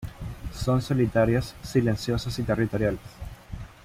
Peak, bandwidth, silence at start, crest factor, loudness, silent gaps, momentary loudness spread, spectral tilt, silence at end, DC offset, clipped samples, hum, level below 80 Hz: -10 dBFS; 15.5 kHz; 0 s; 16 dB; -26 LUFS; none; 18 LU; -7 dB/octave; 0.1 s; under 0.1%; under 0.1%; none; -42 dBFS